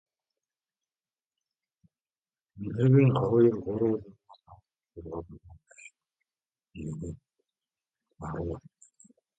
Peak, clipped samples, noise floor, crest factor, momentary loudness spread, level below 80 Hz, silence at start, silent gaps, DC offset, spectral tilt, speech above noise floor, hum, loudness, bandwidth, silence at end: -12 dBFS; under 0.1%; under -90 dBFS; 20 dB; 21 LU; -56 dBFS; 2.55 s; none; under 0.1%; -9.5 dB/octave; over 63 dB; none; -27 LUFS; 8.6 kHz; 0.8 s